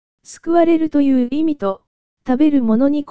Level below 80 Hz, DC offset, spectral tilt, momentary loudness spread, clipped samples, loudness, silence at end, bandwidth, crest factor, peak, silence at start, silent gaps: -50 dBFS; 3%; -7 dB/octave; 13 LU; under 0.1%; -16 LUFS; 0 s; 8 kHz; 14 dB; -2 dBFS; 0.2 s; 1.87-2.17 s